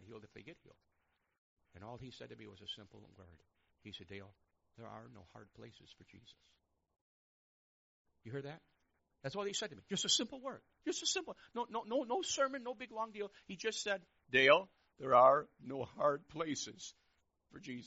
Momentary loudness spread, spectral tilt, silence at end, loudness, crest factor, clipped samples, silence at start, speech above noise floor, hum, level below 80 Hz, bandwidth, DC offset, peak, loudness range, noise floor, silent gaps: 26 LU; -1.5 dB/octave; 0 s; -36 LUFS; 26 dB; under 0.1%; 0.05 s; 42 dB; none; -76 dBFS; 8 kHz; under 0.1%; -14 dBFS; 23 LU; -81 dBFS; 1.38-1.57 s, 7.01-8.05 s